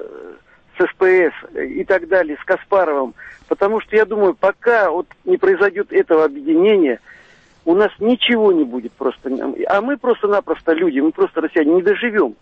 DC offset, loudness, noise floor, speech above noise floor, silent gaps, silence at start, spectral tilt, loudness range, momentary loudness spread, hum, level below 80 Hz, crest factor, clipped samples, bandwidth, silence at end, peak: under 0.1%; -16 LUFS; -42 dBFS; 26 dB; none; 0 s; -6.5 dB/octave; 2 LU; 10 LU; none; -56 dBFS; 12 dB; under 0.1%; 5.8 kHz; 0.1 s; -4 dBFS